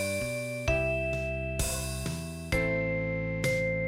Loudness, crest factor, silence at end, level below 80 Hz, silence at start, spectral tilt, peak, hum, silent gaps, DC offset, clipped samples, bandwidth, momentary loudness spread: -31 LUFS; 16 dB; 0 s; -40 dBFS; 0 s; -5 dB/octave; -14 dBFS; none; none; under 0.1%; under 0.1%; 16.5 kHz; 5 LU